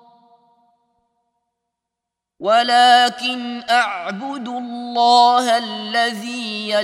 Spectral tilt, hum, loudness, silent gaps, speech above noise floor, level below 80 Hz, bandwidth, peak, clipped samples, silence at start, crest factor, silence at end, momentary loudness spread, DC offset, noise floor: -2.5 dB/octave; 60 Hz at -45 dBFS; -17 LUFS; none; 66 dB; -76 dBFS; 14 kHz; 0 dBFS; under 0.1%; 2.4 s; 18 dB; 0 s; 15 LU; under 0.1%; -83 dBFS